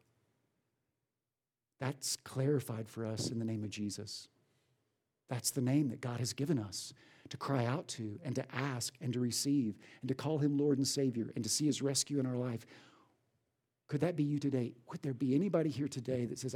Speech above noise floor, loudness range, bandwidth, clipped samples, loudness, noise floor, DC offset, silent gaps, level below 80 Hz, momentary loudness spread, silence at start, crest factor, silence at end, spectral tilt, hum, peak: over 54 dB; 5 LU; 17.5 kHz; under 0.1%; -36 LUFS; under -90 dBFS; under 0.1%; none; -80 dBFS; 10 LU; 1.8 s; 18 dB; 0 s; -5 dB/octave; none; -18 dBFS